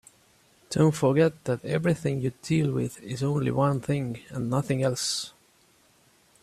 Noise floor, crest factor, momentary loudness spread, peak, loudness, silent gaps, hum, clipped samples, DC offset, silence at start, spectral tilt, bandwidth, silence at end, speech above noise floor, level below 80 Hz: -62 dBFS; 18 dB; 9 LU; -10 dBFS; -27 LUFS; none; none; under 0.1%; under 0.1%; 0.7 s; -6 dB/octave; 14 kHz; 1.15 s; 36 dB; -60 dBFS